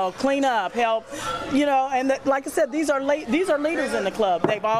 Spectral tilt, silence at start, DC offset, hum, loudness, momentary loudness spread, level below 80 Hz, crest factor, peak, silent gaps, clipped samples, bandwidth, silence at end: -4 dB/octave; 0 s; under 0.1%; none; -23 LUFS; 3 LU; -56 dBFS; 14 dB; -8 dBFS; none; under 0.1%; 15 kHz; 0 s